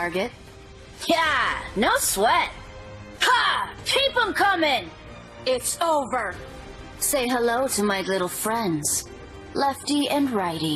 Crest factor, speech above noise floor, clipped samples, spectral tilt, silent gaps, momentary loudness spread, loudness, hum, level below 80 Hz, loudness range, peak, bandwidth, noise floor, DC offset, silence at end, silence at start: 18 dB; 21 dB; under 0.1%; -2.5 dB/octave; none; 20 LU; -23 LUFS; none; -48 dBFS; 3 LU; -8 dBFS; 14 kHz; -44 dBFS; under 0.1%; 0 s; 0 s